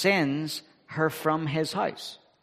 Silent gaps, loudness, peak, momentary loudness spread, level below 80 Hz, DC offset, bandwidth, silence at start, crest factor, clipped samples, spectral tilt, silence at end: none; -28 LUFS; -8 dBFS; 13 LU; -70 dBFS; under 0.1%; 15.5 kHz; 0 s; 20 dB; under 0.1%; -5 dB/octave; 0.25 s